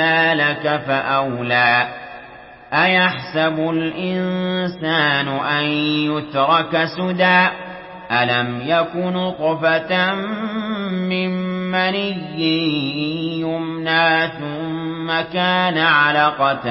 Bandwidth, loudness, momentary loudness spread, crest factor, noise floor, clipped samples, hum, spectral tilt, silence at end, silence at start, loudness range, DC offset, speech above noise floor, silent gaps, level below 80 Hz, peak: 5.8 kHz; -18 LUFS; 9 LU; 16 dB; -40 dBFS; under 0.1%; none; -10 dB/octave; 0 s; 0 s; 3 LU; under 0.1%; 22 dB; none; -58 dBFS; -2 dBFS